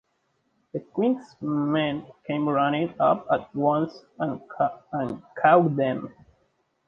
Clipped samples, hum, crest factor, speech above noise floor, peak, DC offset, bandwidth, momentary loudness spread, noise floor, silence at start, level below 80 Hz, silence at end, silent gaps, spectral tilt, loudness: under 0.1%; none; 20 dB; 47 dB; -4 dBFS; under 0.1%; 6.6 kHz; 13 LU; -72 dBFS; 0.75 s; -66 dBFS; 0.75 s; none; -8.5 dB/octave; -25 LUFS